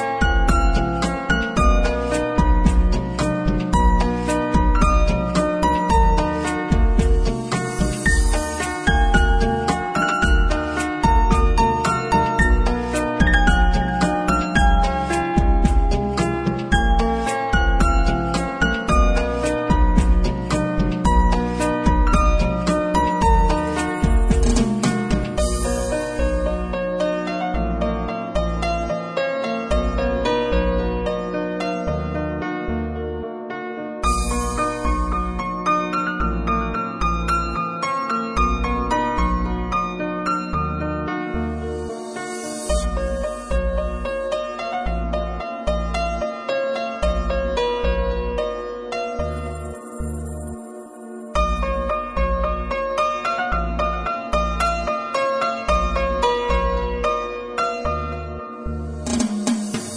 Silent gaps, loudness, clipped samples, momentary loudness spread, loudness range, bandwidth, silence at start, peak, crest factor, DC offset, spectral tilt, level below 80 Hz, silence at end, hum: none; -21 LUFS; under 0.1%; 8 LU; 6 LU; 11 kHz; 0 s; -2 dBFS; 16 dB; under 0.1%; -5.5 dB/octave; -22 dBFS; 0 s; none